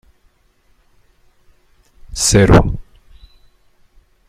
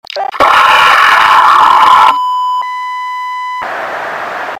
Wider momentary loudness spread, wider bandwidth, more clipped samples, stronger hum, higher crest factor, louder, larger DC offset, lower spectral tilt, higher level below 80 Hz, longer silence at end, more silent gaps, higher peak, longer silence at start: first, 21 LU vs 13 LU; second, 15 kHz vs 18 kHz; second, under 0.1% vs 4%; neither; first, 18 dB vs 8 dB; second, -12 LUFS vs -8 LUFS; neither; first, -5 dB/octave vs -1 dB/octave; first, -28 dBFS vs -48 dBFS; first, 1.45 s vs 0 s; neither; about the same, 0 dBFS vs 0 dBFS; first, 2.1 s vs 0.1 s